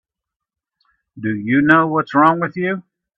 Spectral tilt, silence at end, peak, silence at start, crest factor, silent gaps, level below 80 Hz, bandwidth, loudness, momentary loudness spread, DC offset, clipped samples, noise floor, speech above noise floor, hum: -8.5 dB/octave; 0.4 s; 0 dBFS; 1.15 s; 18 dB; none; -60 dBFS; 5.8 kHz; -16 LUFS; 12 LU; under 0.1%; under 0.1%; -84 dBFS; 69 dB; none